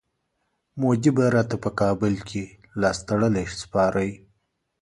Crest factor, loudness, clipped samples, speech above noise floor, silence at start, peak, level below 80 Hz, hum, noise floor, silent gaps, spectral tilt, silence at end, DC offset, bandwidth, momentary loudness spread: 18 dB; -24 LUFS; under 0.1%; 52 dB; 0.75 s; -6 dBFS; -50 dBFS; none; -75 dBFS; none; -6.5 dB/octave; 0.65 s; under 0.1%; 11.5 kHz; 12 LU